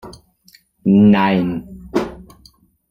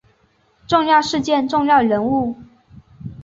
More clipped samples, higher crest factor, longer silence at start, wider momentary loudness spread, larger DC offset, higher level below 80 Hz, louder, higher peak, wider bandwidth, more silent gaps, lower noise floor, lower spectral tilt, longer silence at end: neither; about the same, 16 dB vs 16 dB; second, 0.05 s vs 0.7 s; second, 15 LU vs 20 LU; neither; first, -46 dBFS vs -52 dBFS; about the same, -16 LUFS vs -17 LUFS; about the same, -2 dBFS vs -2 dBFS; second, 6.8 kHz vs 7.8 kHz; neither; second, -52 dBFS vs -59 dBFS; first, -8 dB/octave vs -5 dB/octave; first, 0.7 s vs 0 s